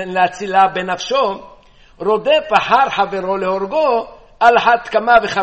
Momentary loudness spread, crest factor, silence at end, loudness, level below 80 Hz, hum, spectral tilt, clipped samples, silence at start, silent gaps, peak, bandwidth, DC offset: 8 LU; 16 dB; 0 s; -15 LUFS; -48 dBFS; none; -4 dB/octave; under 0.1%; 0 s; none; 0 dBFS; 8.4 kHz; 0.2%